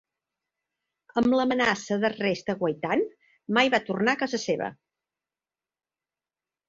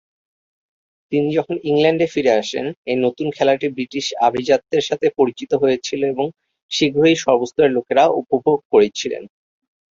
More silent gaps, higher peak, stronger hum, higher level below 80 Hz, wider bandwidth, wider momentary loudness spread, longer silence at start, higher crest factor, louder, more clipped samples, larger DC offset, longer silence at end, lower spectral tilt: second, none vs 2.77-2.85 s, 6.62-6.69 s, 8.65-8.70 s; second, -6 dBFS vs 0 dBFS; neither; second, -66 dBFS vs -60 dBFS; about the same, 7.6 kHz vs 7.6 kHz; about the same, 8 LU vs 8 LU; about the same, 1.15 s vs 1.1 s; about the same, 22 dB vs 18 dB; second, -26 LUFS vs -18 LUFS; neither; neither; first, 1.95 s vs 0.65 s; about the same, -4.5 dB/octave vs -5 dB/octave